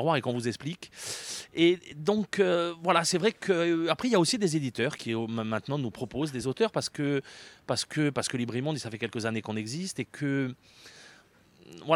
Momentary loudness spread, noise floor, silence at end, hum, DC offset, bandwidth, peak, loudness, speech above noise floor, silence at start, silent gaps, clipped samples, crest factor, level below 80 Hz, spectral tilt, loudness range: 11 LU; -59 dBFS; 0 s; none; under 0.1%; 14.5 kHz; -10 dBFS; -29 LUFS; 30 dB; 0 s; none; under 0.1%; 20 dB; -68 dBFS; -4.5 dB/octave; 6 LU